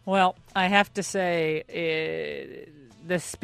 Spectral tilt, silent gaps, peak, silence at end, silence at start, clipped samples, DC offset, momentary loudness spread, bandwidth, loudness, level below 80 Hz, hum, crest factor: -4 dB/octave; none; -4 dBFS; 0.05 s; 0.05 s; under 0.1%; under 0.1%; 13 LU; 14 kHz; -26 LUFS; -62 dBFS; none; 22 dB